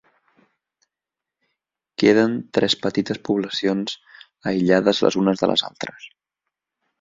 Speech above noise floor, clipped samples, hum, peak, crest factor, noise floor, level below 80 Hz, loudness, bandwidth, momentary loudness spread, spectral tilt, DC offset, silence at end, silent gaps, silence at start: 67 dB; under 0.1%; none; -2 dBFS; 20 dB; -87 dBFS; -60 dBFS; -20 LUFS; 7.8 kHz; 14 LU; -5 dB/octave; under 0.1%; 0.95 s; none; 2 s